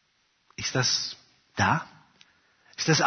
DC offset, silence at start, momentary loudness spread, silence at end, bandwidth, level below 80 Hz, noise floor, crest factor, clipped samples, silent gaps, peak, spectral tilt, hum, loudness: under 0.1%; 0.6 s; 21 LU; 0 s; 6.6 kHz; -64 dBFS; -70 dBFS; 22 dB; under 0.1%; none; -8 dBFS; -3 dB/octave; none; -27 LUFS